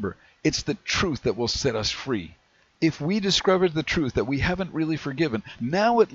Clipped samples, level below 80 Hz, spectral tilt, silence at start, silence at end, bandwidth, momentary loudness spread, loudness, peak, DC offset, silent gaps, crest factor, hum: under 0.1%; -46 dBFS; -4.5 dB/octave; 0 s; 0 s; 8 kHz; 7 LU; -25 LUFS; -6 dBFS; under 0.1%; none; 18 dB; none